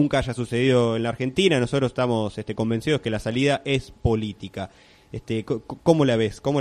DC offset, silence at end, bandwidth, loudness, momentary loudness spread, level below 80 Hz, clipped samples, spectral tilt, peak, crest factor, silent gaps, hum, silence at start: under 0.1%; 0 s; 12.5 kHz; -23 LUFS; 12 LU; -44 dBFS; under 0.1%; -6 dB/octave; -4 dBFS; 18 dB; none; none; 0 s